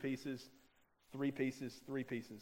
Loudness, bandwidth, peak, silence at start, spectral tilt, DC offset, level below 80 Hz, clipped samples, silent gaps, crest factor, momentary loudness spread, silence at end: -44 LUFS; 16 kHz; -26 dBFS; 0 s; -6 dB/octave; under 0.1%; -76 dBFS; under 0.1%; none; 18 dB; 12 LU; 0 s